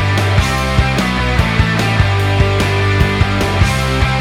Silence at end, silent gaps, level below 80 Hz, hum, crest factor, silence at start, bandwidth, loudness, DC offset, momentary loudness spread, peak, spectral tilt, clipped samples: 0 s; none; -22 dBFS; none; 12 dB; 0 s; 15.5 kHz; -14 LUFS; under 0.1%; 1 LU; 0 dBFS; -5.5 dB/octave; under 0.1%